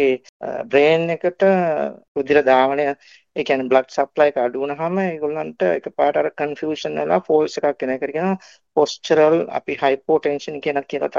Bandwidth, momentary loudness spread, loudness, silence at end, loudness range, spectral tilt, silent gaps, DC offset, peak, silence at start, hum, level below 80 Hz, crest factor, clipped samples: 7.4 kHz; 10 LU; -19 LUFS; 0 s; 3 LU; -5.5 dB/octave; 0.29-0.40 s, 2.08-2.15 s; under 0.1%; -2 dBFS; 0 s; none; -66 dBFS; 18 dB; under 0.1%